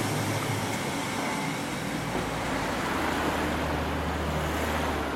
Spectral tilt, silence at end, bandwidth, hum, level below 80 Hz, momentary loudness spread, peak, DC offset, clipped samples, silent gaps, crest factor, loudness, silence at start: -4.5 dB/octave; 0 s; 16.5 kHz; none; -42 dBFS; 3 LU; -16 dBFS; under 0.1%; under 0.1%; none; 14 dB; -29 LUFS; 0 s